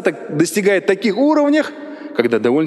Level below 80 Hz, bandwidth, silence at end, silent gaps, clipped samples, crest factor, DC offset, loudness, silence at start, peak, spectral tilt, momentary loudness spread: -70 dBFS; 12.5 kHz; 0 s; none; under 0.1%; 16 dB; under 0.1%; -16 LUFS; 0 s; 0 dBFS; -5 dB/octave; 9 LU